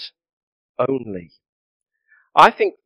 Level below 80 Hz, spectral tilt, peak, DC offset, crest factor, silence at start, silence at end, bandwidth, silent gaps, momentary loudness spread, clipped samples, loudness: -62 dBFS; -5 dB/octave; 0 dBFS; under 0.1%; 22 dB; 0 s; 0.15 s; 11.5 kHz; 0.33-0.75 s, 1.49-1.80 s; 23 LU; 0.2%; -17 LUFS